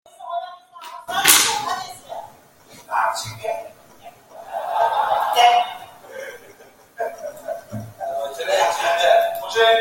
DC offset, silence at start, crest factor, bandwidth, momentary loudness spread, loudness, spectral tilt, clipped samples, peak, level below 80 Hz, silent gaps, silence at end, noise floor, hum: under 0.1%; 0.2 s; 22 dB; 17 kHz; 21 LU; -19 LUFS; -0.5 dB/octave; under 0.1%; 0 dBFS; -64 dBFS; none; 0 s; -48 dBFS; none